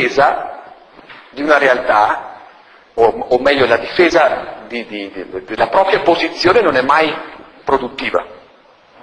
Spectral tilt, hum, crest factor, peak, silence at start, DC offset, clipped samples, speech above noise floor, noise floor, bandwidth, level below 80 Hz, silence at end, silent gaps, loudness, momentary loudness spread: -4.5 dB/octave; none; 16 dB; 0 dBFS; 0 s; under 0.1%; under 0.1%; 33 dB; -47 dBFS; 11 kHz; -46 dBFS; 0.65 s; none; -14 LUFS; 16 LU